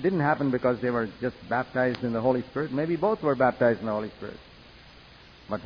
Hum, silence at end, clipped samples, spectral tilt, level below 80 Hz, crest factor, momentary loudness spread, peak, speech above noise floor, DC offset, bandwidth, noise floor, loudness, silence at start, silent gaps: none; 0 s; under 0.1%; -9 dB/octave; -58 dBFS; 16 dB; 11 LU; -10 dBFS; 25 dB; under 0.1%; 5.4 kHz; -51 dBFS; -27 LUFS; 0 s; none